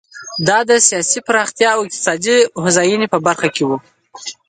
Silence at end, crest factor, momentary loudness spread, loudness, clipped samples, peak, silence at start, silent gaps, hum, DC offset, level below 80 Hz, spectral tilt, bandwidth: 0.15 s; 16 dB; 9 LU; -14 LUFS; under 0.1%; 0 dBFS; 0.15 s; none; none; under 0.1%; -62 dBFS; -2.5 dB/octave; 9.6 kHz